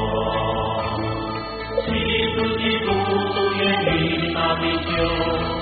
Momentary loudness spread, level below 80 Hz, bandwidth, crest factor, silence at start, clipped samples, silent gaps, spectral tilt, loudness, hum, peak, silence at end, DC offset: 6 LU; -38 dBFS; 4.8 kHz; 14 dB; 0 s; under 0.1%; none; -3.5 dB/octave; -21 LUFS; none; -8 dBFS; 0 s; under 0.1%